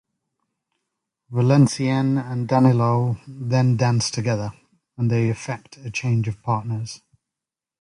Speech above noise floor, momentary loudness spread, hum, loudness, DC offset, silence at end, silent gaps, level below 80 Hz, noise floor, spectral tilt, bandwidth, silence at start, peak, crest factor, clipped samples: 67 dB; 13 LU; none; -21 LUFS; under 0.1%; 0.85 s; none; -56 dBFS; -88 dBFS; -6.5 dB/octave; 11 kHz; 1.3 s; -4 dBFS; 18 dB; under 0.1%